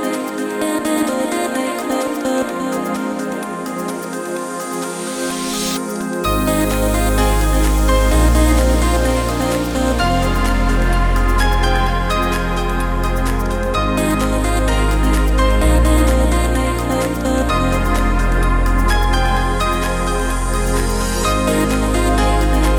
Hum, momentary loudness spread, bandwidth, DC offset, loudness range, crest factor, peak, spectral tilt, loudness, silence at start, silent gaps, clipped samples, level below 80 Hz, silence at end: none; 7 LU; over 20 kHz; under 0.1%; 6 LU; 14 dB; -2 dBFS; -5 dB/octave; -17 LUFS; 0 s; none; under 0.1%; -18 dBFS; 0 s